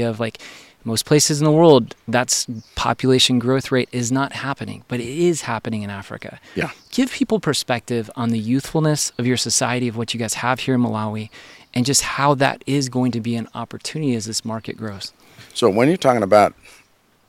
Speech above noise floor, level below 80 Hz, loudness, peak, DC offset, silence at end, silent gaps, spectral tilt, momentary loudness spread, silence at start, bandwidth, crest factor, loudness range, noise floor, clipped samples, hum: 37 dB; -52 dBFS; -19 LUFS; 0 dBFS; under 0.1%; 0.75 s; none; -4.5 dB/octave; 15 LU; 0 s; 16.5 kHz; 20 dB; 6 LU; -56 dBFS; under 0.1%; none